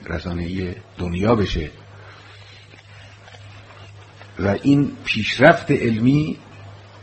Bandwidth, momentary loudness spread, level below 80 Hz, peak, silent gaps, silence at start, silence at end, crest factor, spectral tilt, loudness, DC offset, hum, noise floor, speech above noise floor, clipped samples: 8.4 kHz; 27 LU; -40 dBFS; 0 dBFS; none; 0 s; 0 s; 22 dB; -7 dB/octave; -19 LUFS; under 0.1%; none; -44 dBFS; 25 dB; under 0.1%